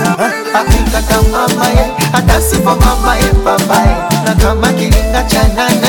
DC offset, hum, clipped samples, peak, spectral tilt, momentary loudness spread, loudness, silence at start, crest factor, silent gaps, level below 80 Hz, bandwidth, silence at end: under 0.1%; none; under 0.1%; 0 dBFS; -4.5 dB/octave; 2 LU; -11 LUFS; 0 s; 10 dB; none; -14 dBFS; 17.5 kHz; 0 s